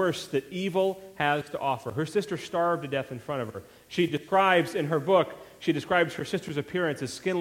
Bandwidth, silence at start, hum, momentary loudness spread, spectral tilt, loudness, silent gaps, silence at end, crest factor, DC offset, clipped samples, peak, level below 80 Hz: 16.5 kHz; 0 s; none; 10 LU; -5.5 dB/octave; -28 LUFS; none; 0 s; 20 dB; under 0.1%; under 0.1%; -8 dBFS; -66 dBFS